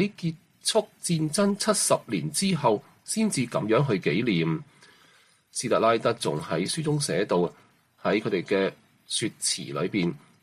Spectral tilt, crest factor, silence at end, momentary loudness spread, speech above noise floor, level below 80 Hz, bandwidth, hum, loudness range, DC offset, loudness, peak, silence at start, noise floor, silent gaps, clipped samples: -4.5 dB/octave; 16 dB; 0.25 s; 7 LU; 34 dB; -66 dBFS; 15 kHz; none; 3 LU; under 0.1%; -26 LUFS; -10 dBFS; 0 s; -60 dBFS; none; under 0.1%